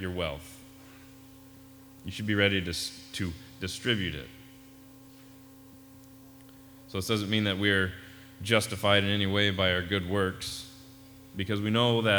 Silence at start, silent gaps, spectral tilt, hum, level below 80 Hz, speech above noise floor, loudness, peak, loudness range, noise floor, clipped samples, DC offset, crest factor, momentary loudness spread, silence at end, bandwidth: 0 s; none; -4.5 dB/octave; none; -56 dBFS; 23 dB; -28 LUFS; -8 dBFS; 10 LU; -52 dBFS; under 0.1%; under 0.1%; 22 dB; 22 LU; 0 s; over 20 kHz